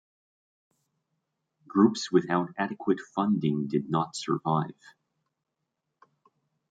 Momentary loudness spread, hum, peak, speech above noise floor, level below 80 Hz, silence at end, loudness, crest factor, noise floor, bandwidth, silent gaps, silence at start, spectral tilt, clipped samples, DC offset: 7 LU; none; -8 dBFS; 57 dB; -74 dBFS; 2 s; -27 LUFS; 22 dB; -84 dBFS; 9.2 kHz; none; 1.75 s; -6.5 dB/octave; under 0.1%; under 0.1%